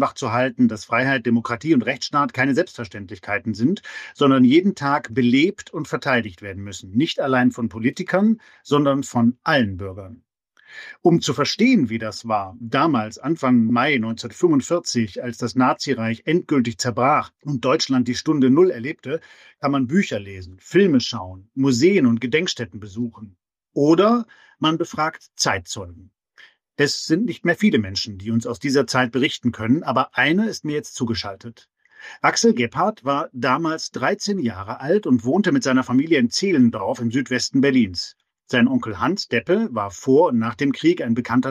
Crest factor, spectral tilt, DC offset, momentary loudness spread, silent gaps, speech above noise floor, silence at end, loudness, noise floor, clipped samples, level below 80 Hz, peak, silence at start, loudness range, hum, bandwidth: 16 dB; -5 dB/octave; under 0.1%; 12 LU; none; 32 dB; 0 s; -20 LUFS; -52 dBFS; under 0.1%; -60 dBFS; -4 dBFS; 0 s; 3 LU; none; 11.5 kHz